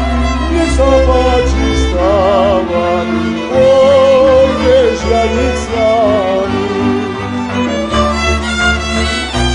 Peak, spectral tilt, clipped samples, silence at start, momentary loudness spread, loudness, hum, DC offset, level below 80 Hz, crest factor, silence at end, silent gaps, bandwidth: 0 dBFS; -5.5 dB/octave; under 0.1%; 0 s; 7 LU; -11 LUFS; none; under 0.1%; -20 dBFS; 10 dB; 0 s; none; 10.5 kHz